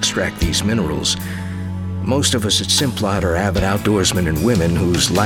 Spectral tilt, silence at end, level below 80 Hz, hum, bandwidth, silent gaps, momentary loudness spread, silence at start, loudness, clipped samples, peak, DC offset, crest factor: -4 dB/octave; 0 s; -34 dBFS; none; 17.5 kHz; none; 9 LU; 0 s; -17 LUFS; under 0.1%; -2 dBFS; under 0.1%; 16 dB